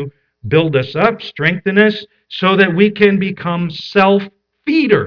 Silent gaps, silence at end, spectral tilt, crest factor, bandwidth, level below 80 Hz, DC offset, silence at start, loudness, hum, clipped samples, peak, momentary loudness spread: none; 0 s; -8 dB/octave; 14 dB; 5.4 kHz; -54 dBFS; under 0.1%; 0 s; -14 LUFS; none; under 0.1%; 0 dBFS; 15 LU